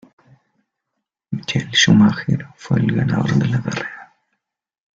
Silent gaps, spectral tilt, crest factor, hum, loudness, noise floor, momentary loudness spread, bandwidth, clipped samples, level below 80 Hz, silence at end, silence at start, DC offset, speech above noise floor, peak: none; -5 dB/octave; 18 dB; none; -17 LUFS; -78 dBFS; 16 LU; 7.6 kHz; under 0.1%; -50 dBFS; 0.9 s; 1.3 s; under 0.1%; 62 dB; -2 dBFS